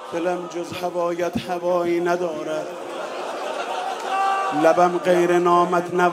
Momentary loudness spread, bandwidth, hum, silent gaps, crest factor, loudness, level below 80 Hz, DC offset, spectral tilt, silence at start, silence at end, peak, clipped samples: 12 LU; 15 kHz; none; none; 20 dB; -22 LUFS; -66 dBFS; under 0.1%; -5.5 dB/octave; 0 s; 0 s; -2 dBFS; under 0.1%